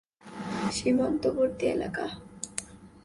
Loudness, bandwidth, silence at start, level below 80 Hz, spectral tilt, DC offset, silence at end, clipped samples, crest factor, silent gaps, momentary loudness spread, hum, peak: -30 LUFS; 11.5 kHz; 0.25 s; -56 dBFS; -4.5 dB/octave; under 0.1%; 0.05 s; under 0.1%; 18 dB; none; 14 LU; none; -12 dBFS